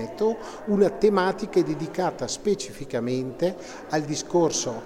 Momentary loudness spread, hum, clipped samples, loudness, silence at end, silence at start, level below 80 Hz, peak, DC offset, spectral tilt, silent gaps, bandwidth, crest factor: 8 LU; none; under 0.1%; -25 LUFS; 0 s; 0 s; -54 dBFS; -8 dBFS; under 0.1%; -5 dB/octave; none; 15 kHz; 18 dB